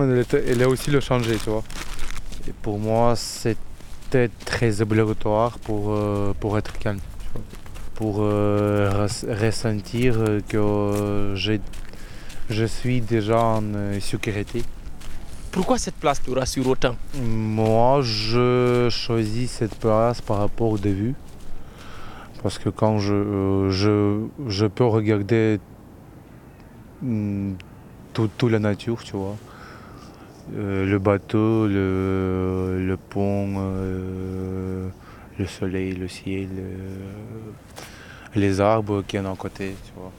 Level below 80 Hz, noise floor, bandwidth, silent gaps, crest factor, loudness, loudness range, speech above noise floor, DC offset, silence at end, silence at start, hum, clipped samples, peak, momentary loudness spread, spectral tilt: -36 dBFS; -44 dBFS; 15.5 kHz; none; 20 dB; -23 LUFS; 6 LU; 23 dB; under 0.1%; 0 s; 0 s; none; under 0.1%; -4 dBFS; 20 LU; -6.5 dB/octave